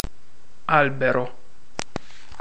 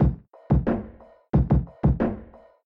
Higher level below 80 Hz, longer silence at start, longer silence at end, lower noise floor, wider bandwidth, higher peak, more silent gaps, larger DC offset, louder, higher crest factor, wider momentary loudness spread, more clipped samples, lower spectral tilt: second, -44 dBFS vs -30 dBFS; about the same, 0 s vs 0 s; first, 1.1 s vs 0.4 s; first, -57 dBFS vs -46 dBFS; first, 8.8 kHz vs 3.9 kHz; first, -4 dBFS vs -8 dBFS; neither; first, 4% vs under 0.1%; about the same, -22 LUFS vs -24 LUFS; first, 22 dB vs 16 dB; about the same, 18 LU vs 17 LU; neither; second, -5.5 dB/octave vs -12 dB/octave